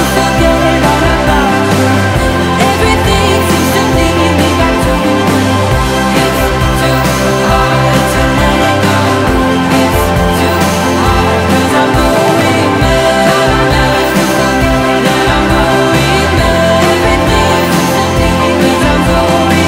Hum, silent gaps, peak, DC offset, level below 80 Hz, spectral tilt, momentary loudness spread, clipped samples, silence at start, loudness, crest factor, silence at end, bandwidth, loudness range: none; none; 0 dBFS; under 0.1%; -20 dBFS; -5 dB/octave; 2 LU; under 0.1%; 0 s; -9 LUFS; 8 dB; 0 s; 16.5 kHz; 1 LU